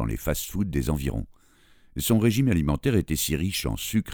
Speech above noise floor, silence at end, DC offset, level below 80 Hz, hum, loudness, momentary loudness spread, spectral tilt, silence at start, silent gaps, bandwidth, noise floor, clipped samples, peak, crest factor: 32 dB; 0 s; under 0.1%; -36 dBFS; none; -25 LUFS; 9 LU; -5.5 dB/octave; 0 s; none; over 20 kHz; -56 dBFS; under 0.1%; -8 dBFS; 18 dB